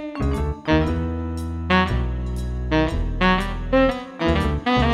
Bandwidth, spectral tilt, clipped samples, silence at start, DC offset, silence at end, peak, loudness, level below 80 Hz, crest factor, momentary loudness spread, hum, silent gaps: 12.5 kHz; -7 dB/octave; under 0.1%; 0 s; under 0.1%; 0 s; -4 dBFS; -22 LUFS; -28 dBFS; 18 dB; 8 LU; none; none